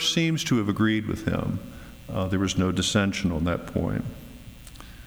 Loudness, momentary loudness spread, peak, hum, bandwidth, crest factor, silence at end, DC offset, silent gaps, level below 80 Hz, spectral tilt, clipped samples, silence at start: -26 LUFS; 21 LU; -10 dBFS; none; over 20 kHz; 16 dB; 0 s; under 0.1%; none; -44 dBFS; -5 dB/octave; under 0.1%; 0 s